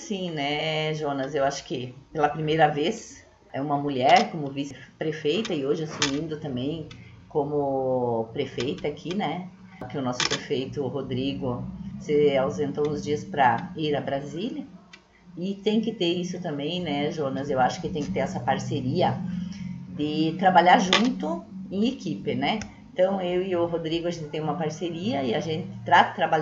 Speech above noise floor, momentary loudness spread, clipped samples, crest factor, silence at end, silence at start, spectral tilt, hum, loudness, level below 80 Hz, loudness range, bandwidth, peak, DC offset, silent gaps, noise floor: 27 dB; 13 LU; under 0.1%; 26 dB; 0 s; 0 s; -5 dB/octave; none; -26 LUFS; -56 dBFS; 6 LU; 8 kHz; 0 dBFS; under 0.1%; none; -52 dBFS